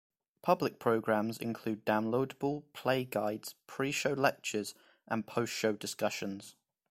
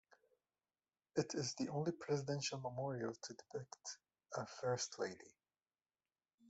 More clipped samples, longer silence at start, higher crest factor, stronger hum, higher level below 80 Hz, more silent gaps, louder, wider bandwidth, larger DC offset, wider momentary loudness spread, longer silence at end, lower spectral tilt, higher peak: neither; second, 0.45 s vs 1.15 s; about the same, 22 dB vs 22 dB; neither; first, -74 dBFS vs -82 dBFS; second, none vs 6.34-6.38 s; first, -34 LUFS vs -44 LUFS; first, 16.5 kHz vs 8.2 kHz; neither; second, 8 LU vs 11 LU; first, 0.4 s vs 0 s; about the same, -4.5 dB/octave vs -4.5 dB/octave; first, -12 dBFS vs -24 dBFS